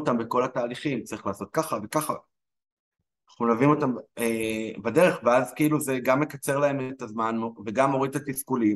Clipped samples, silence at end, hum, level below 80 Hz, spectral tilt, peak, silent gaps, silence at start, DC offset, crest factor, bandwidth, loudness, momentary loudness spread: under 0.1%; 0 s; none; -66 dBFS; -5.5 dB/octave; -8 dBFS; 2.72-2.91 s; 0 s; under 0.1%; 18 dB; 13 kHz; -26 LUFS; 9 LU